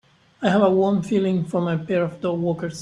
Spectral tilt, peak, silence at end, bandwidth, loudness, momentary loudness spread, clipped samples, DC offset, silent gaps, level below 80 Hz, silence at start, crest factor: -7.5 dB/octave; -4 dBFS; 0 s; 11 kHz; -21 LUFS; 7 LU; under 0.1%; under 0.1%; none; -60 dBFS; 0.4 s; 18 dB